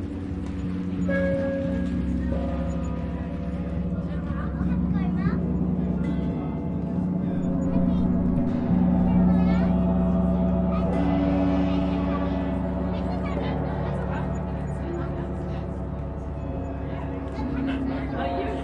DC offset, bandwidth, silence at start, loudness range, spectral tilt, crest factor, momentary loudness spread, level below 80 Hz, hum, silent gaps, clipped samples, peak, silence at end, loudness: under 0.1%; 7.2 kHz; 0 s; 8 LU; -9.5 dB/octave; 14 dB; 9 LU; -34 dBFS; none; none; under 0.1%; -10 dBFS; 0 s; -26 LUFS